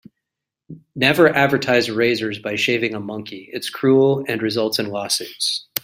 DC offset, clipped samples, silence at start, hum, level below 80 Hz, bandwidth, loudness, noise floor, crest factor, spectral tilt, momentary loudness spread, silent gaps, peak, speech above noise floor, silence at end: under 0.1%; under 0.1%; 0.7 s; none; -60 dBFS; 16 kHz; -18 LUFS; -84 dBFS; 20 dB; -4 dB/octave; 14 LU; none; 0 dBFS; 65 dB; 0.05 s